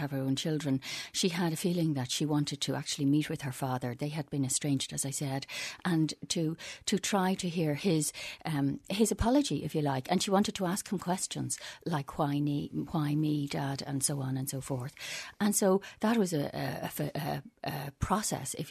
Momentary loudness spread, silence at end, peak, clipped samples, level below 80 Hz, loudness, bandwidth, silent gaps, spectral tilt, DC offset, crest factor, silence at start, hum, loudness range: 8 LU; 0 s; -14 dBFS; under 0.1%; -56 dBFS; -32 LUFS; 13.5 kHz; none; -4.5 dB/octave; under 0.1%; 18 dB; 0 s; none; 2 LU